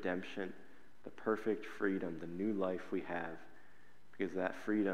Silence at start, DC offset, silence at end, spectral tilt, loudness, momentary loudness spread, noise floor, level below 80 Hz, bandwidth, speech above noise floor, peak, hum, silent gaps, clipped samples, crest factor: 0 s; 0.4%; 0 s; -7 dB/octave; -40 LUFS; 11 LU; -67 dBFS; -78 dBFS; 13 kHz; 28 dB; -20 dBFS; none; none; under 0.1%; 20 dB